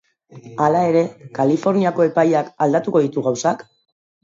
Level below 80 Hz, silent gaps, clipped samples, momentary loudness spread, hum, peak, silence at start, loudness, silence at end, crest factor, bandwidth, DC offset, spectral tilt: -68 dBFS; none; under 0.1%; 6 LU; none; -2 dBFS; 0.35 s; -18 LUFS; 0.6 s; 16 dB; 7.8 kHz; under 0.1%; -6.5 dB/octave